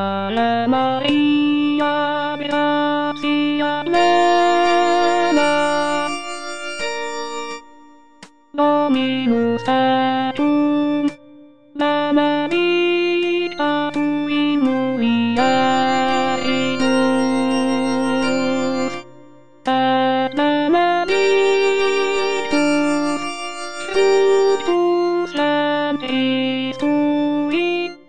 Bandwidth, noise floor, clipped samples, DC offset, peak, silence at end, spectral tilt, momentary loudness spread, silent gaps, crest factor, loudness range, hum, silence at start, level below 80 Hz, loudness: 9.6 kHz; -47 dBFS; under 0.1%; 0.9%; -4 dBFS; 0 s; -4.5 dB/octave; 8 LU; none; 14 dB; 3 LU; none; 0 s; -56 dBFS; -18 LUFS